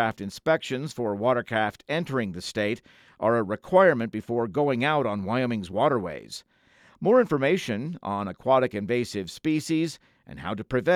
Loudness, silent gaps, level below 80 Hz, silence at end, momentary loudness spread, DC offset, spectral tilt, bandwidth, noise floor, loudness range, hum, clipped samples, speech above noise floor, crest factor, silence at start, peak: -26 LUFS; none; -62 dBFS; 0 s; 11 LU; under 0.1%; -6 dB/octave; 14.5 kHz; -59 dBFS; 3 LU; none; under 0.1%; 33 dB; 20 dB; 0 s; -6 dBFS